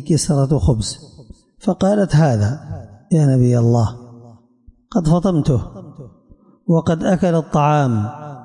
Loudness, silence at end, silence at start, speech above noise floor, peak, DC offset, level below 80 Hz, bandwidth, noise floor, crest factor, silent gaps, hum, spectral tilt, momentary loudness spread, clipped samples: -17 LUFS; 0 s; 0 s; 34 dB; -6 dBFS; under 0.1%; -38 dBFS; 11.5 kHz; -50 dBFS; 12 dB; none; none; -7 dB/octave; 15 LU; under 0.1%